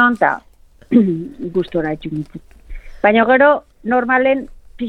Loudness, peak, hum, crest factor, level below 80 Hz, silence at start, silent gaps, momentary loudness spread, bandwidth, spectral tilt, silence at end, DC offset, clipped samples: -16 LUFS; 0 dBFS; none; 16 dB; -40 dBFS; 0 s; none; 15 LU; 5.4 kHz; -8 dB/octave; 0 s; under 0.1%; under 0.1%